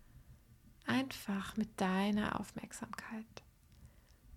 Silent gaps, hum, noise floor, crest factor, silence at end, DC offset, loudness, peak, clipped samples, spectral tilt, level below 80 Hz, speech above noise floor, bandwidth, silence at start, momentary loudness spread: none; none; -63 dBFS; 18 dB; 0 s; under 0.1%; -39 LUFS; -22 dBFS; under 0.1%; -5 dB/octave; -62 dBFS; 24 dB; 16 kHz; 0.15 s; 13 LU